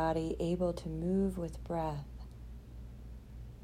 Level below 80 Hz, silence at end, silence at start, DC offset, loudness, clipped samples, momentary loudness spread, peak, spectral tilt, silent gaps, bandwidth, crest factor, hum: -48 dBFS; 0 s; 0 s; under 0.1%; -36 LUFS; under 0.1%; 18 LU; -20 dBFS; -8 dB/octave; none; 14.5 kHz; 16 dB; none